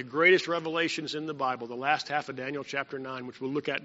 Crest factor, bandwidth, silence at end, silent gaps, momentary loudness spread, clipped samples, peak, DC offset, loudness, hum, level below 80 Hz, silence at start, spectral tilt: 20 dB; 8 kHz; 0 s; none; 14 LU; under 0.1%; -8 dBFS; under 0.1%; -29 LUFS; none; -76 dBFS; 0 s; -2 dB/octave